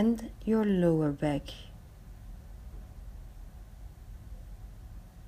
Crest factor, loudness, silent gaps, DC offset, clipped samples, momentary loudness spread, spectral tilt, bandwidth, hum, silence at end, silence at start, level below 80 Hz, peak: 20 dB; -29 LUFS; none; under 0.1%; under 0.1%; 24 LU; -8 dB/octave; 15.5 kHz; none; 0 s; 0 s; -48 dBFS; -14 dBFS